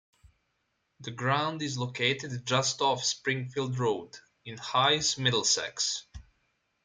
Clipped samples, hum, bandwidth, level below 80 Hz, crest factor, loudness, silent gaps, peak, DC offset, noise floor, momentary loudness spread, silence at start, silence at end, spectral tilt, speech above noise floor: under 0.1%; none; 10 kHz; -62 dBFS; 20 dB; -28 LUFS; none; -10 dBFS; under 0.1%; -78 dBFS; 15 LU; 1 s; 0.65 s; -3 dB/octave; 48 dB